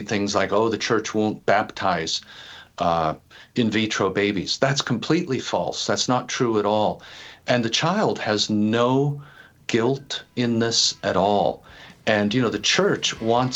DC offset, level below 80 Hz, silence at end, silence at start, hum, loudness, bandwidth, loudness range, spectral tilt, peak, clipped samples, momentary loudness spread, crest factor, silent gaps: under 0.1%; -58 dBFS; 0 s; 0 s; none; -22 LUFS; 8.6 kHz; 2 LU; -4 dB/octave; -4 dBFS; under 0.1%; 9 LU; 18 dB; none